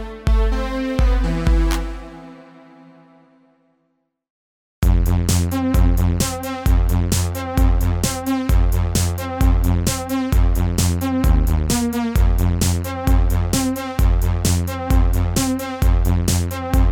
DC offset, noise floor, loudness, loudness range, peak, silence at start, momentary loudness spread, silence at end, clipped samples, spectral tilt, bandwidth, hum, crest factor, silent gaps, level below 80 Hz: under 0.1%; -69 dBFS; -19 LUFS; 6 LU; -2 dBFS; 0 s; 4 LU; 0 s; under 0.1%; -5.5 dB/octave; 18 kHz; none; 16 dB; 4.30-4.82 s; -20 dBFS